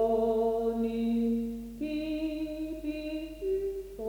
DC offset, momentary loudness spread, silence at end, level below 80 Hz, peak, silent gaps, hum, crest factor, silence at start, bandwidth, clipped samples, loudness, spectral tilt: under 0.1%; 9 LU; 0 s; -50 dBFS; -18 dBFS; none; 50 Hz at -65 dBFS; 14 dB; 0 s; over 20 kHz; under 0.1%; -32 LUFS; -7 dB/octave